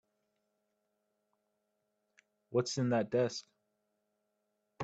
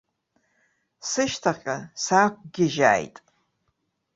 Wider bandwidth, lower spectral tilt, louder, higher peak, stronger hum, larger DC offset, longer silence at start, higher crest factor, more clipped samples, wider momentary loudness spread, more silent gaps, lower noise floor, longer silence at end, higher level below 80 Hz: about the same, 8.8 kHz vs 8.2 kHz; first, -5.5 dB/octave vs -4 dB/octave; second, -34 LUFS vs -23 LUFS; second, -20 dBFS vs -4 dBFS; neither; neither; first, 2.5 s vs 1.05 s; about the same, 20 dB vs 22 dB; neither; second, 5 LU vs 11 LU; neither; first, -83 dBFS vs -75 dBFS; second, 0 s vs 1.1 s; second, -82 dBFS vs -64 dBFS